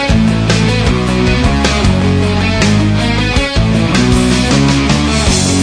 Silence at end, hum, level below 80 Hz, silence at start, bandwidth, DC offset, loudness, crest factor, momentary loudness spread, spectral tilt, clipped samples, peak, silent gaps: 0 s; none; -20 dBFS; 0 s; 11 kHz; under 0.1%; -11 LUFS; 10 dB; 2 LU; -5 dB/octave; under 0.1%; 0 dBFS; none